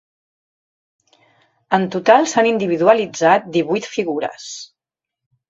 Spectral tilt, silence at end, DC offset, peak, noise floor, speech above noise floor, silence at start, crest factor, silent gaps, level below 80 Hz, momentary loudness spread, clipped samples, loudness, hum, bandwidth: -4.5 dB/octave; 0.85 s; under 0.1%; 0 dBFS; -85 dBFS; 69 dB; 1.7 s; 18 dB; none; -66 dBFS; 13 LU; under 0.1%; -16 LUFS; none; 7.8 kHz